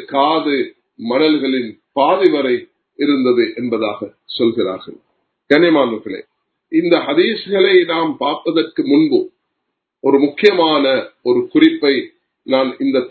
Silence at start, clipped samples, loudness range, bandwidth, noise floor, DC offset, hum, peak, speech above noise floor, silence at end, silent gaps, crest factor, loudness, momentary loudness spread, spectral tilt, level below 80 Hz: 0 s; under 0.1%; 3 LU; 6.2 kHz; -75 dBFS; under 0.1%; none; 0 dBFS; 61 dB; 0 s; none; 16 dB; -15 LUFS; 10 LU; -7 dB/octave; -64 dBFS